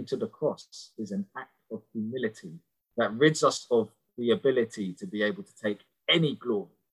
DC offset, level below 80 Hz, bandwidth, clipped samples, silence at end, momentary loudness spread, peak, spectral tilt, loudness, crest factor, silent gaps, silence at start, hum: under 0.1%; -74 dBFS; 12 kHz; under 0.1%; 0.25 s; 17 LU; -8 dBFS; -4.5 dB/octave; -29 LUFS; 22 dB; none; 0 s; none